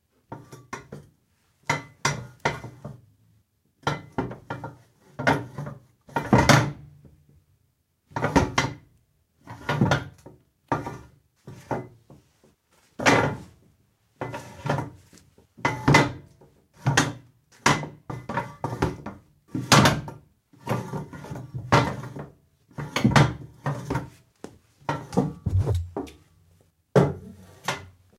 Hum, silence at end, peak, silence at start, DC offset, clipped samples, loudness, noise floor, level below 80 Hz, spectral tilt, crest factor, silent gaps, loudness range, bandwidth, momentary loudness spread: none; 0.3 s; -2 dBFS; 0.3 s; under 0.1%; under 0.1%; -25 LUFS; -70 dBFS; -46 dBFS; -5 dB/octave; 26 dB; none; 7 LU; 16 kHz; 24 LU